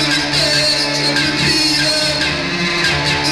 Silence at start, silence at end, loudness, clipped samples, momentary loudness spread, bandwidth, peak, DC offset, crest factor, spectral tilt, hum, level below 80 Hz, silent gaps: 0 s; 0 s; -13 LUFS; under 0.1%; 4 LU; 16 kHz; -2 dBFS; under 0.1%; 14 dB; -2.5 dB/octave; none; -38 dBFS; none